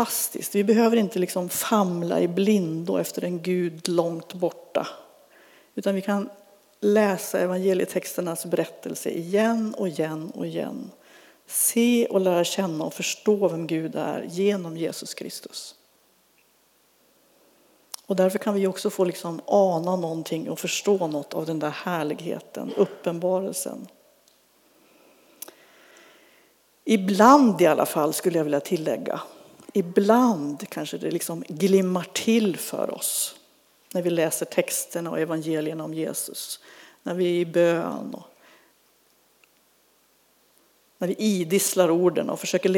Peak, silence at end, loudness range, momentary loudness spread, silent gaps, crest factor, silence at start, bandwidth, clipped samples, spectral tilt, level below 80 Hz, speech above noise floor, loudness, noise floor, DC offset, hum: -2 dBFS; 0 s; 9 LU; 13 LU; none; 22 dB; 0 s; over 20 kHz; under 0.1%; -4.5 dB/octave; -82 dBFS; 39 dB; -24 LUFS; -63 dBFS; under 0.1%; none